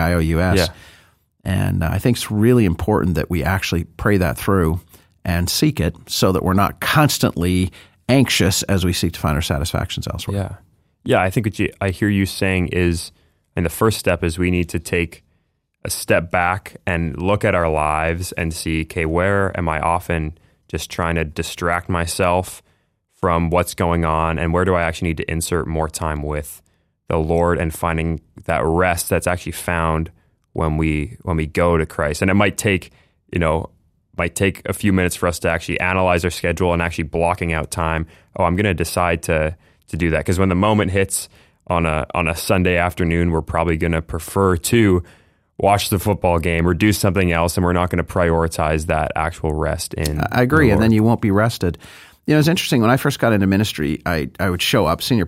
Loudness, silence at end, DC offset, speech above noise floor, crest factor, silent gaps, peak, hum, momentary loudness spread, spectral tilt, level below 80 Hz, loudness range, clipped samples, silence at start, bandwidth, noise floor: -19 LUFS; 0 s; under 0.1%; 48 dB; 18 dB; none; 0 dBFS; none; 8 LU; -5.5 dB/octave; -36 dBFS; 4 LU; under 0.1%; 0 s; 16 kHz; -66 dBFS